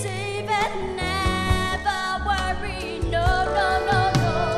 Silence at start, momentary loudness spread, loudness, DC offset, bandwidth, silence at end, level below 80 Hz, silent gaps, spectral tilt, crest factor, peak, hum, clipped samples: 0 s; 7 LU; -23 LUFS; under 0.1%; 14 kHz; 0 s; -32 dBFS; none; -5 dB/octave; 18 dB; -4 dBFS; none; under 0.1%